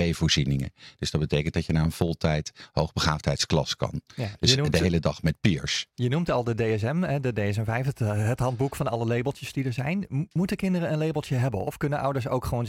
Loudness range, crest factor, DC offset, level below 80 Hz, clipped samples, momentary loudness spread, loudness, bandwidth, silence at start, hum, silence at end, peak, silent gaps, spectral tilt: 3 LU; 22 dB; under 0.1%; -46 dBFS; under 0.1%; 6 LU; -26 LUFS; 16 kHz; 0 s; none; 0 s; -4 dBFS; none; -5.5 dB/octave